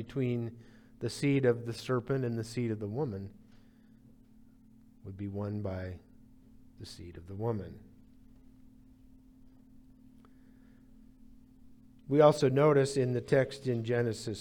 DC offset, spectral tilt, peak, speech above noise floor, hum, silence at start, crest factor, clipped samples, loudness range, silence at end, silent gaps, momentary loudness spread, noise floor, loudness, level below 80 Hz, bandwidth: under 0.1%; -7 dB/octave; -10 dBFS; 28 dB; none; 0 s; 24 dB; under 0.1%; 15 LU; 0 s; none; 23 LU; -59 dBFS; -31 LUFS; -64 dBFS; 16.5 kHz